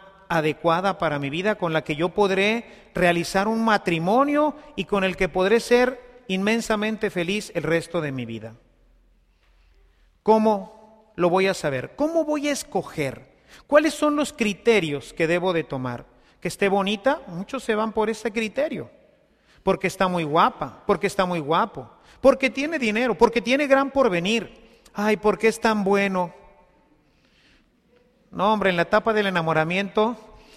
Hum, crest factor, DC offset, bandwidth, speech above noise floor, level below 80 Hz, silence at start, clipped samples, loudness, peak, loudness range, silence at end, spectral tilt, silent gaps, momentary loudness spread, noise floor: none; 20 dB; under 0.1%; 15 kHz; 38 dB; -52 dBFS; 0.3 s; under 0.1%; -22 LUFS; -4 dBFS; 5 LU; 0.35 s; -5 dB/octave; none; 11 LU; -60 dBFS